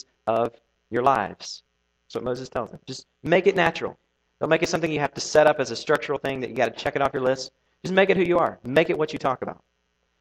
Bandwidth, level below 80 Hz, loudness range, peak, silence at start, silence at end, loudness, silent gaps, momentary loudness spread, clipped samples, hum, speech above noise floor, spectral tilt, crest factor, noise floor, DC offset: 15 kHz; -58 dBFS; 4 LU; -4 dBFS; 0.25 s; 0.7 s; -23 LUFS; none; 16 LU; under 0.1%; none; 48 dB; -5 dB/octave; 20 dB; -72 dBFS; under 0.1%